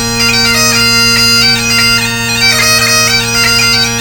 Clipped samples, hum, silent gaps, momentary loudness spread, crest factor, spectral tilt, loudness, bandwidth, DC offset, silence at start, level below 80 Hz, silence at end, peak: 0.3%; none; none; 3 LU; 8 dB; -1.5 dB/octave; -6 LUFS; 19 kHz; under 0.1%; 0 s; -30 dBFS; 0 s; 0 dBFS